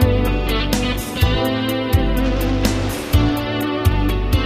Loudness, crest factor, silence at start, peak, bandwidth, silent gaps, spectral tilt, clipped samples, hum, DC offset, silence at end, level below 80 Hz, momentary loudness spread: -19 LUFS; 16 dB; 0 s; -2 dBFS; 16 kHz; none; -6 dB/octave; under 0.1%; none; under 0.1%; 0 s; -22 dBFS; 3 LU